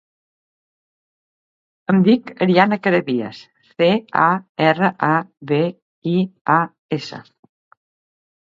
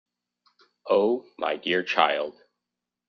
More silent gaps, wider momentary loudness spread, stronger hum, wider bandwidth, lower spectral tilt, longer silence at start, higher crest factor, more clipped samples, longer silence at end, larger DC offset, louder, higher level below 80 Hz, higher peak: first, 4.49-4.55 s, 5.82-6.02 s, 6.41-6.45 s, 6.78-6.89 s vs none; about the same, 12 LU vs 10 LU; second, none vs 60 Hz at -55 dBFS; about the same, 7.4 kHz vs 6.8 kHz; first, -8 dB/octave vs -1 dB/octave; first, 1.9 s vs 0.85 s; about the same, 20 dB vs 24 dB; neither; first, 1.35 s vs 0.8 s; neither; first, -18 LUFS vs -25 LUFS; first, -66 dBFS vs -74 dBFS; first, 0 dBFS vs -4 dBFS